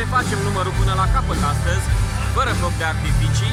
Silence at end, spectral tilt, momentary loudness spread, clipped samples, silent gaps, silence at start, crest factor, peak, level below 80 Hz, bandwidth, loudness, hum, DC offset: 0 s; -5 dB/octave; 2 LU; under 0.1%; none; 0 s; 12 dB; -6 dBFS; -24 dBFS; 15.5 kHz; -20 LUFS; none; under 0.1%